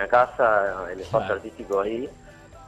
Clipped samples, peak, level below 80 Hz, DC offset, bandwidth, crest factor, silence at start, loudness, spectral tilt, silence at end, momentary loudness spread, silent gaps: under 0.1%; -6 dBFS; -52 dBFS; under 0.1%; 10.5 kHz; 18 dB; 0 s; -24 LUFS; -6 dB/octave; 0 s; 13 LU; none